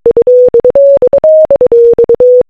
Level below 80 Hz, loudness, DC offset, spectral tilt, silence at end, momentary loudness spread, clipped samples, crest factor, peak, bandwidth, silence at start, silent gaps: -38 dBFS; -5 LUFS; under 0.1%; -9 dB/octave; 0.05 s; 1 LU; 3%; 4 dB; 0 dBFS; 2.7 kHz; 0.05 s; none